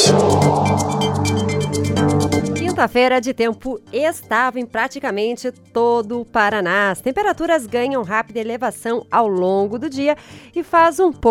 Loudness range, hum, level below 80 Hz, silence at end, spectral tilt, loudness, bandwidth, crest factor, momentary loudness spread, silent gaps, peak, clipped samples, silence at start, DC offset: 2 LU; none; -46 dBFS; 0 s; -5 dB/octave; -18 LUFS; 16.5 kHz; 16 dB; 8 LU; none; -2 dBFS; under 0.1%; 0 s; under 0.1%